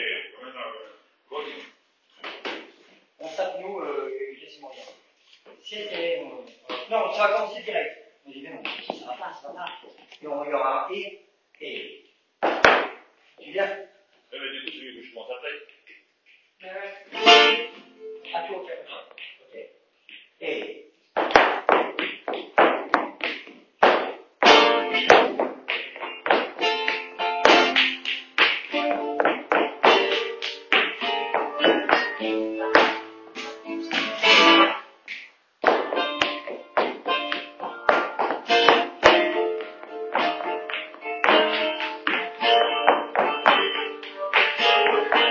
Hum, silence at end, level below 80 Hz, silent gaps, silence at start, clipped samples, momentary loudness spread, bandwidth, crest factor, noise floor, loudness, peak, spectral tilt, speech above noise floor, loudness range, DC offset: none; 0 s; -64 dBFS; none; 0 s; under 0.1%; 21 LU; 7.2 kHz; 24 dB; -61 dBFS; -21 LUFS; 0 dBFS; -2.5 dB/octave; 32 dB; 15 LU; under 0.1%